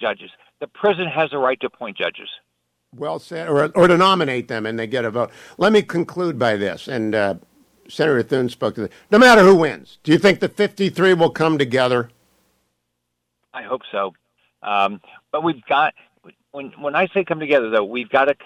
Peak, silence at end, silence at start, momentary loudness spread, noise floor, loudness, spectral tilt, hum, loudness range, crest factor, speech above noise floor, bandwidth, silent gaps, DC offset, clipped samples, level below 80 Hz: -4 dBFS; 0.1 s; 0 s; 16 LU; -76 dBFS; -18 LUFS; -5.5 dB/octave; 60 Hz at -45 dBFS; 9 LU; 16 dB; 57 dB; 14.5 kHz; none; under 0.1%; under 0.1%; -58 dBFS